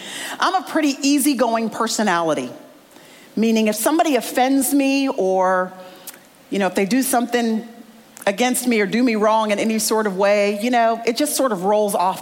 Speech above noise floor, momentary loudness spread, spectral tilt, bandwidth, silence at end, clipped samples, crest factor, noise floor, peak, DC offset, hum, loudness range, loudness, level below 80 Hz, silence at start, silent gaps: 27 dB; 8 LU; -3.5 dB/octave; 17 kHz; 0 s; under 0.1%; 12 dB; -45 dBFS; -6 dBFS; under 0.1%; none; 3 LU; -19 LUFS; -68 dBFS; 0 s; none